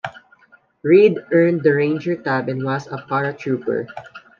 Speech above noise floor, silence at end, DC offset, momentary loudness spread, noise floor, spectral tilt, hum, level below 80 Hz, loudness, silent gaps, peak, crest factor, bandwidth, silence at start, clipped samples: 36 dB; 0.2 s; under 0.1%; 14 LU; -53 dBFS; -8.5 dB/octave; none; -68 dBFS; -18 LUFS; none; -2 dBFS; 16 dB; 7 kHz; 0.05 s; under 0.1%